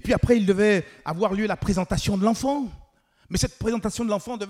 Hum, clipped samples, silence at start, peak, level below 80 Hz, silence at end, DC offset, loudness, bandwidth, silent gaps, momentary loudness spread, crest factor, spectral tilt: none; under 0.1%; 0.05 s; -6 dBFS; -40 dBFS; 0 s; under 0.1%; -24 LUFS; 15.5 kHz; none; 8 LU; 18 dB; -5.5 dB/octave